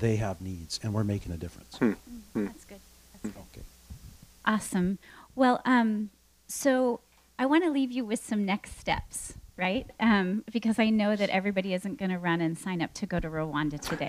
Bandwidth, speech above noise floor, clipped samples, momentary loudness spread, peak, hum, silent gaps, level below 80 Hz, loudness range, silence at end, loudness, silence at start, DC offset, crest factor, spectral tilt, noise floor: 15.5 kHz; 22 dB; under 0.1%; 16 LU; -10 dBFS; none; none; -52 dBFS; 7 LU; 0 s; -29 LUFS; 0 s; under 0.1%; 20 dB; -5.5 dB/octave; -50 dBFS